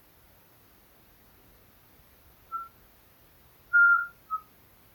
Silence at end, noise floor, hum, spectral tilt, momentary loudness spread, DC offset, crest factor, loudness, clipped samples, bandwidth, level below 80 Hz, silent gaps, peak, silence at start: 0.55 s; -59 dBFS; none; -3 dB/octave; 20 LU; under 0.1%; 18 dB; -25 LUFS; under 0.1%; 19 kHz; -66 dBFS; none; -14 dBFS; 2.5 s